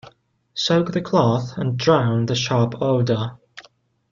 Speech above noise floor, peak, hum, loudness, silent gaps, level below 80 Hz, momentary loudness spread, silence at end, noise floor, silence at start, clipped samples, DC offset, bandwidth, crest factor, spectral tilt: 36 dB; -4 dBFS; none; -20 LUFS; none; -56 dBFS; 7 LU; 0.5 s; -56 dBFS; 0.05 s; under 0.1%; under 0.1%; 7.4 kHz; 18 dB; -6 dB/octave